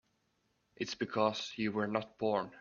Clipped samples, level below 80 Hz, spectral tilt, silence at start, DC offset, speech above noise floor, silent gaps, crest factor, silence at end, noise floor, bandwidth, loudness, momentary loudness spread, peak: under 0.1%; -74 dBFS; -5 dB/octave; 0.8 s; under 0.1%; 43 dB; none; 22 dB; 0 s; -78 dBFS; 7.4 kHz; -36 LUFS; 7 LU; -16 dBFS